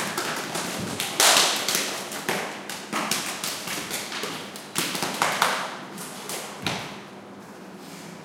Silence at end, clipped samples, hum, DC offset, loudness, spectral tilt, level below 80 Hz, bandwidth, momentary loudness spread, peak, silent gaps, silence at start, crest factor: 0 s; under 0.1%; none; under 0.1%; -25 LUFS; -1 dB/octave; -68 dBFS; 17 kHz; 21 LU; 0 dBFS; none; 0 s; 28 dB